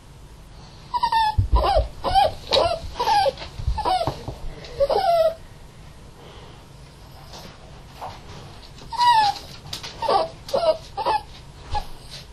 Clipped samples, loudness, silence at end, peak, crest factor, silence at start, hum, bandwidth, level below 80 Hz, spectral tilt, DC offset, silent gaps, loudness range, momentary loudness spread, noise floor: under 0.1%; -22 LUFS; 0 s; -4 dBFS; 20 dB; 0.1 s; none; 14 kHz; -34 dBFS; -4.5 dB/octave; under 0.1%; none; 8 LU; 23 LU; -43 dBFS